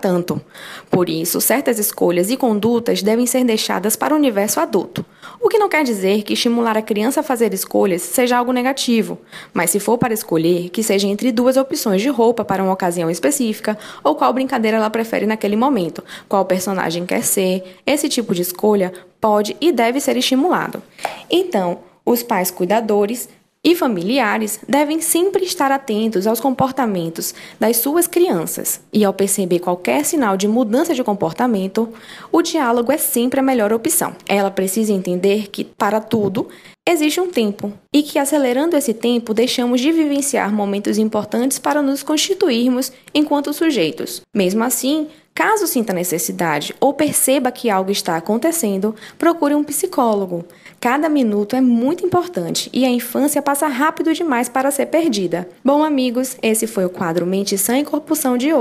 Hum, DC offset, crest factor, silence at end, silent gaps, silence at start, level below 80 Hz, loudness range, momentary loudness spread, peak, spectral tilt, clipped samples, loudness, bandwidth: none; under 0.1%; 16 dB; 0 s; none; 0 s; -62 dBFS; 2 LU; 5 LU; -2 dBFS; -4 dB/octave; under 0.1%; -17 LUFS; 15.5 kHz